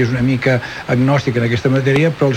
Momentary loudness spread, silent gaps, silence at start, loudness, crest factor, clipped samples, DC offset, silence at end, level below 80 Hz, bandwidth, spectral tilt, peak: 3 LU; none; 0 s; -15 LUFS; 12 dB; under 0.1%; under 0.1%; 0 s; -44 dBFS; 9.4 kHz; -7.5 dB/octave; -2 dBFS